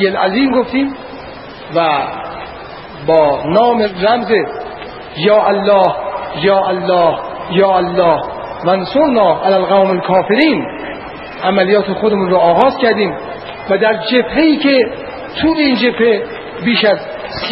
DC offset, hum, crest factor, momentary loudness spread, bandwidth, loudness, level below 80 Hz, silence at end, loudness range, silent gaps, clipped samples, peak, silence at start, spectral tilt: 0.1%; none; 14 dB; 15 LU; 5.8 kHz; -13 LUFS; -44 dBFS; 0 s; 2 LU; none; under 0.1%; 0 dBFS; 0 s; -8.5 dB/octave